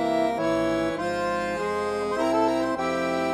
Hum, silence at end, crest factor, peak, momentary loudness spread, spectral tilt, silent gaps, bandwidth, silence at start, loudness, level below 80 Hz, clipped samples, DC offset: none; 0 s; 14 dB; -12 dBFS; 4 LU; -5 dB/octave; none; 14 kHz; 0 s; -25 LUFS; -52 dBFS; under 0.1%; under 0.1%